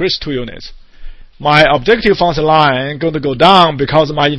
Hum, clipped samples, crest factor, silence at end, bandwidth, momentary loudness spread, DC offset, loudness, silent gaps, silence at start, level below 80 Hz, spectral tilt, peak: none; 0.4%; 12 dB; 0 s; 11 kHz; 11 LU; under 0.1%; -11 LUFS; none; 0 s; -32 dBFS; -6 dB/octave; 0 dBFS